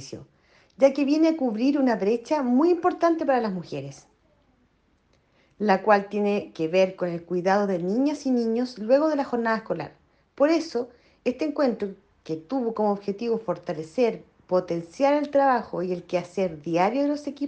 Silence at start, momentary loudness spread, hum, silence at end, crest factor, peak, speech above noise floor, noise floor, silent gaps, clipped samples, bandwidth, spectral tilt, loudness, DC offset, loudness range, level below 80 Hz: 0 s; 11 LU; none; 0 s; 20 dB; -6 dBFS; 41 dB; -65 dBFS; none; under 0.1%; 8.8 kHz; -6.5 dB/octave; -24 LUFS; under 0.1%; 5 LU; -66 dBFS